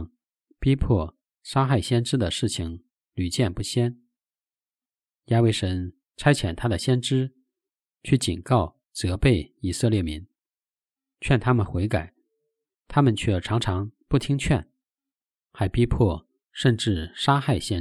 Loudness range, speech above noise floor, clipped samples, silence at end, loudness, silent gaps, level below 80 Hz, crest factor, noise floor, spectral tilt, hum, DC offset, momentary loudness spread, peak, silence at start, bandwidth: 2 LU; over 67 dB; under 0.1%; 0 s; -24 LUFS; none; -42 dBFS; 20 dB; under -90 dBFS; -6 dB/octave; none; under 0.1%; 11 LU; -4 dBFS; 0 s; 12.5 kHz